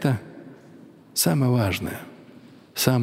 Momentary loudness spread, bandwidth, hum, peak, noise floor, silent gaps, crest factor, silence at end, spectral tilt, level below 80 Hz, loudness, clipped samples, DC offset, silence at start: 23 LU; 16 kHz; none; -4 dBFS; -48 dBFS; none; 20 dB; 0 s; -5 dB/octave; -56 dBFS; -24 LUFS; under 0.1%; under 0.1%; 0 s